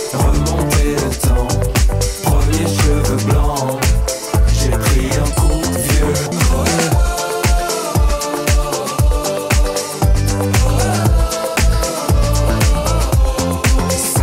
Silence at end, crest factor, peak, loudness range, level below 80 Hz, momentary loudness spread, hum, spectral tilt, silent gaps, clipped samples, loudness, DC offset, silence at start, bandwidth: 0 s; 10 dB; -4 dBFS; 1 LU; -16 dBFS; 3 LU; none; -5 dB/octave; none; under 0.1%; -16 LUFS; under 0.1%; 0 s; 16.5 kHz